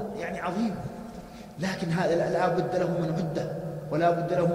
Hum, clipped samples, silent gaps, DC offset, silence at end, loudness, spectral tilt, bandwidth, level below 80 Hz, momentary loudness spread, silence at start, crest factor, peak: none; under 0.1%; none; under 0.1%; 0 s; -28 LUFS; -7 dB/octave; 15 kHz; -56 dBFS; 13 LU; 0 s; 16 dB; -12 dBFS